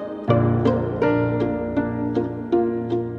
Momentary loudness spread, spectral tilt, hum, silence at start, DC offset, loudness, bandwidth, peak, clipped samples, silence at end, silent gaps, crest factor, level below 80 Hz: 5 LU; -10 dB/octave; none; 0 s; under 0.1%; -22 LUFS; 5.8 kHz; -4 dBFS; under 0.1%; 0 s; none; 18 dB; -44 dBFS